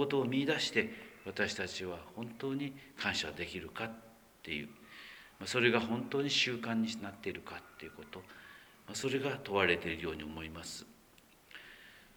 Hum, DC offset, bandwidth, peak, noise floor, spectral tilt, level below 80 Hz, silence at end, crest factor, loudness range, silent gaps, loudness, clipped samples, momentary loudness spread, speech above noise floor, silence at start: none; under 0.1%; over 20 kHz; -14 dBFS; -63 dBFS; -4 dB/octave; -66 dBFS; 0.1 s; 24 dB; 5 LU; none; -36 LUFS; under 0.1%; 21 LU; 27 dB; 0 s